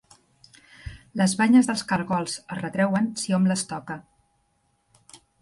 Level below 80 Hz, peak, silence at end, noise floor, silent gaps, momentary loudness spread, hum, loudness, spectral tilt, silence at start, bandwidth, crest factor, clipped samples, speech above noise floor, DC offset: -56 dBFS; -8 dBFS; 0.25 s; -69 dBFS; none; 20 LU; none; -24 LUFS; -5 dB/octave; 0.85 s; 11.5 kHz; 18 dB; under 0.1%; 46 dB; under 0.1%